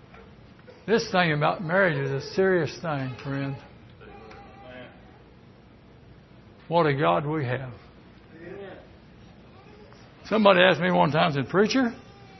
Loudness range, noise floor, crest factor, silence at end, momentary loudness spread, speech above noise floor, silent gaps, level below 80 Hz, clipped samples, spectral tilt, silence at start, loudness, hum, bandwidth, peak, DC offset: 13 LU; -51 dBFS; 24 dB; 0 s; 25 LU; 28 dB; none; -58 dBFS; under 0.1%; -6 dB/octave; 0.15 s; -24 LUFS; none; 6.2 kHz; -4 dBFS; under 0.1%